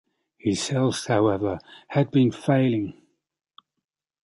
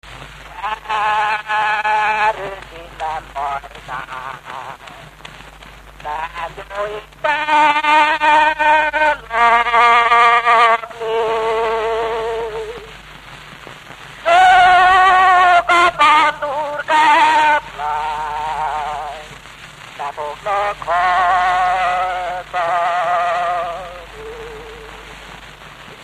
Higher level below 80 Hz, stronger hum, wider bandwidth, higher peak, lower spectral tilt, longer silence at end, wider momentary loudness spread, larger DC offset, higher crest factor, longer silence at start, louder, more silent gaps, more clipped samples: second, -56 dBFS vs -44 dBFS; neither; second, 11.5 kHz vs 14 kHz; second, -8 dBFS vs 0 dBFS; first, -6 dB/octave vs -2.5 dB/octave; first, 1.3 s vs 0 s; second, 8 LU vs 24 LU; neither; about the same, 18 dB vs 16 dB; first, 0.45 s vs 0.05 s; second, -24 LUFS vs -14 LUFS; neither; neither